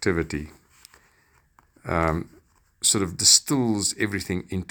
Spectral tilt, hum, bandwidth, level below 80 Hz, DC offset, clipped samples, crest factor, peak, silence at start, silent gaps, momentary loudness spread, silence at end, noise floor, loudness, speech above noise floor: -2.5 dB/octave; none; over 20 kHz; -46 dBFS; under 0.1%; under 0.1%; 24 dB; -2 dBFS; 0 s; none; 18 LU; 0.05 s; -62 dBFS; -22 LUFS; 39 dB